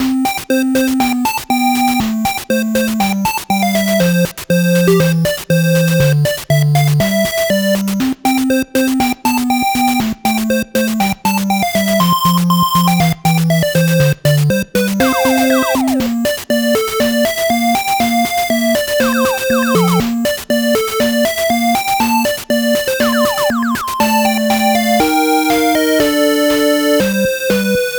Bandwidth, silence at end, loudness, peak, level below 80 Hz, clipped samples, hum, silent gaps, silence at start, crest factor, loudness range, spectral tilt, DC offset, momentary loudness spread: over 20 kHz; 0 s; -13 LUFS; 0 dBFS; -42 dBFS; under 0.1%; none; none; 0 s; 14 dB; 2 LU; -5 dB/octave; under 0.1%; 4 LU